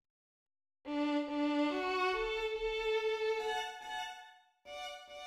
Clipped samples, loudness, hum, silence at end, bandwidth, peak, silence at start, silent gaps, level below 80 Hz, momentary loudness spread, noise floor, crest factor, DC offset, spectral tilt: under 0.1%; -36 LUFS; none; 0 s; 13.5 kHz; -22 dBFS; 0.85 s; none; -62 dBFS; 12 LU; -58 dBFS; 14 dB; under 0.1%; -3 dB/octave